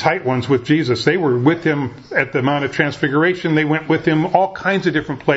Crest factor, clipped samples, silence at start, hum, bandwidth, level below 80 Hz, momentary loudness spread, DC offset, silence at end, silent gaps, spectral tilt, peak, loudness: 16 dB; under 0.1%; 0 s; none; 8 kHz; -52 dBFS; 4 LU; under 0.1%; 0 s; none; -7 dB/octave; 0 dBFS; -17 LUFS